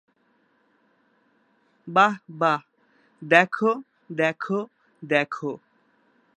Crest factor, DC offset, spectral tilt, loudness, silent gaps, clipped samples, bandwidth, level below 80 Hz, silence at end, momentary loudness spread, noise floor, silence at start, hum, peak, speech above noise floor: 26 dB; under 0.1%; -5.5 dB/octave; -23 LUFS; none; under 0.1%; 10.5 kHz; -82 dBFS; 0.8 s; 19 LU; -66 dBFS; 1.85 s; none; 0 dBFS; 43 dB